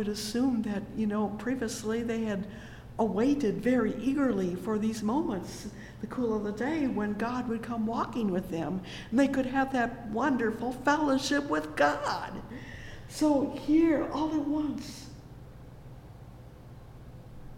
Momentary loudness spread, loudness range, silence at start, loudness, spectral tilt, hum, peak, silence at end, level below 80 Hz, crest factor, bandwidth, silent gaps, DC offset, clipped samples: 22 LU; 3 LU; 0 s; -30 LUFS; -5.5 dB/octave; none; -12 dBFS; 0 s; -52 dBFS; 18 dB; 16.5 kHz; none; under 0.1%; under 0.1%